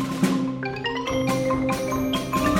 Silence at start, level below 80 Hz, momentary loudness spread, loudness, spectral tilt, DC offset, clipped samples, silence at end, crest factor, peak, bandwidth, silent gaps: 0 s; -44 dBFS; 4 LU; -24 LUFS; -5.5 dB/octave; under 0.1%; under 0.1%; 0 s; 16 dB; -8 dBFS; 17 kHz; none